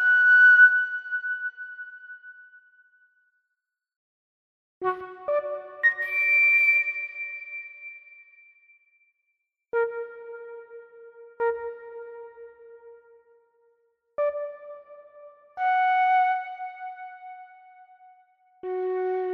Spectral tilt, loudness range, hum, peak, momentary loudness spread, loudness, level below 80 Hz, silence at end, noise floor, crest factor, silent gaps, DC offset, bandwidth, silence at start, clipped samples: -3.5 dB/octave; 14 LU; none; -6 dBFS; 26 LU; -22 LUFS; -78 dBFS; 0 s; -84 dBFS; 20 dB; 3.96-4.81 s; under 0.1%; 13.5 kHz; 0 s; under 0.1%